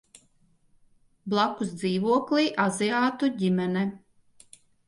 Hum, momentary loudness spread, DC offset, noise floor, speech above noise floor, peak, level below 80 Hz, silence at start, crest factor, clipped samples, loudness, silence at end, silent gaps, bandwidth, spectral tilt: none; 6 LU; under 0.1%; -64 dBFS; 39 dB; -10 dBFS; -70 dBFS; 1.25 s; 18 dB; under 0.1%; -26 LUFS; 0.9 s; none; 11.5 kHz; -5.5 dB/octave